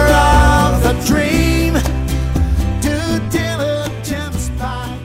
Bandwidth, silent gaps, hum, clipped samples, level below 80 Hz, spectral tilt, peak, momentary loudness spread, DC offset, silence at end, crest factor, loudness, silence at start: 16.5 kHz; none; none; under 0.1%; -20 dBFS; -5.5 dB/octave; -2 dBFS; 11 LU; under 0.1%; 0 s; 12 dB; -16 LUFS; 0 s